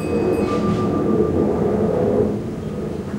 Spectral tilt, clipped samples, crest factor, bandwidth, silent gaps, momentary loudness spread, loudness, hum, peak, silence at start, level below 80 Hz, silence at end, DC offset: -8.5 dB/octave; under 0.1%; 14 dB; 13 kHz; none; 8 LU; -20 LUFS; none; -6 dBFS; 0 s; -42 dBFS; 0 s; under 0.1%